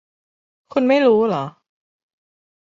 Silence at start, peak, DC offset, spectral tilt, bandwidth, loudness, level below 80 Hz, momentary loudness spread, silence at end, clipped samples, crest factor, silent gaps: 0.75 s; -4 dBFS; under 0.1%; -7 dB/octave; 7.6 kHz; -17 LUFS; -66 dBFS; 11 LU; 1.3 s; under 0.1%; 18 dB; none